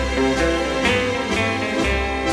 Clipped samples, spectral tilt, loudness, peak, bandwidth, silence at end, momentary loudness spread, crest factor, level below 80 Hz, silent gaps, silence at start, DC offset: under 0.1%; -4.5 dB/octave; -20 LUFS; -6 dBFS; 13.5 kHz; 0 s; 2 LU; 14 dB; -30 dBFS; none; 0 s; under 0.1%